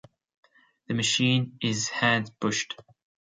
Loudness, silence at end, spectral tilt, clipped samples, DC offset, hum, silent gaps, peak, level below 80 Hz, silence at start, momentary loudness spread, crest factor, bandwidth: -26 LUFS; 0.5 s; -3.5 dB/octave; under 0.1%; under 0.1%; none; none; -8 dBFS; -68 dBFS; 0.9 s; 10 LU; 22 dB; 9.6 kHz